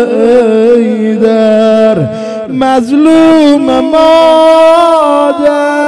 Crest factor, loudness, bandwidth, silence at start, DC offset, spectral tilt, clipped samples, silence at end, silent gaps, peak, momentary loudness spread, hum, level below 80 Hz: 6 dB; -6 LUFS; 11 kHz; 0 s; under 0.1%; -6 dB/octave; 8%; 0 s; none; 0 dBFS; 6 LU; none; -44 dBFS